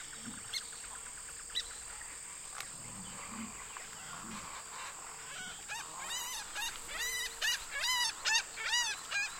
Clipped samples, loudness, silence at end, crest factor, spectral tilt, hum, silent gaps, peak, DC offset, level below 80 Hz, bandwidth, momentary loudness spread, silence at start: under 0.1%; -37 LUFS; 0 s; 22 dB; 1 dB/octave; none; none; -18 dBFS; under 0.1%; -64 dBFS; 16.5 kHz; 12 LU; 0 s